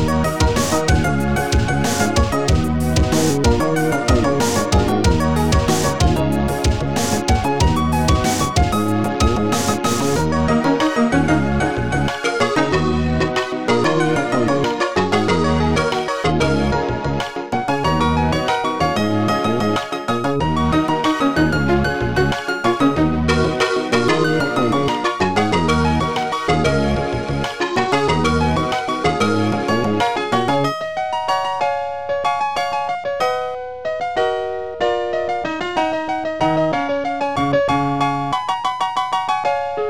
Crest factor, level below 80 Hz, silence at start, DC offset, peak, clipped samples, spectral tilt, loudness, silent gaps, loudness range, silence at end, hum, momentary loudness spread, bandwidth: 16 dB; -28 dBFS; 0 s; under 0.1%; -2 dBFS; under 0.1%; -5.5 dB/octave; -18 LUFS; none; 3 LU; 0 s; none; 5 LU; 18 kHz